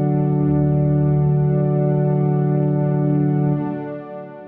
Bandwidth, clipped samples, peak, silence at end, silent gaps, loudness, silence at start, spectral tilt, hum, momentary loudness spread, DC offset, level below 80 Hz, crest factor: 2.8 kHz; under 0.1%; -8 dBFS; 0 s; none; -18 LUFS; 0 s; -14 dB/octave; none; 9 LU; under 0.1%; -44 dBFS; 10 dB